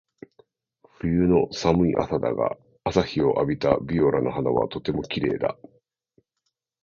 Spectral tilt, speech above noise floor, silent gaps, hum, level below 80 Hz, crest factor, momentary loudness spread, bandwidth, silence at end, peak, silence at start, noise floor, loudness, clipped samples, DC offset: -7 dB/octave; 56 dB; none; none; -46 dBFS; 20 dB; 8 LU; 7.4 kHz; 1.3 s; -4 dBFS; 1.05 s; -79 dBFS; -24 LUFS; under 0.1%; under 0.1%